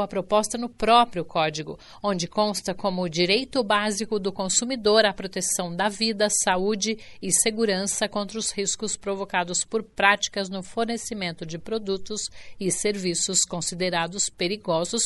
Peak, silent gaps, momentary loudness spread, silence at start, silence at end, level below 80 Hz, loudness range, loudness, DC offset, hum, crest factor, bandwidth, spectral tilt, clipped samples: -4 dBFS; none; 10 LU; 0 s; 0 s; -54 dBFS; 3 LU; -24 LUFS; under 0.1%; none; 22 dB; 11.5 kHz; -2.5 dB/octave; under 0.1%